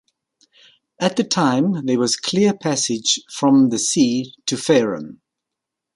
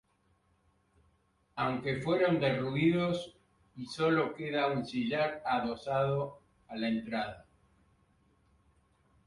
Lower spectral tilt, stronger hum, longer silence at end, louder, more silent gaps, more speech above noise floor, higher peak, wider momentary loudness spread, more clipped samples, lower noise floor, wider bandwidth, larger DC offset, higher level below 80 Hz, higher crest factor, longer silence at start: second, -4 dB/octave vs -7 dB/octave; neither; second, 0.8 s vs 1.85 s; first, -18 LUFS vs -32 LUFS; neither; first, 65 dB vs 40 dB; first, -2 dBFS vs -16 dBFS; second, 8 LU vs 13 LU; neither; first, -83 dBFS vs -72 dBFS; about the same, 11.5 kHz vs 11.5 kHz; neither; about the same, -64 dBFS vs -66 dBFS; about the same, 16 dB vs 18 dB; second, 1 s vs 1.55 s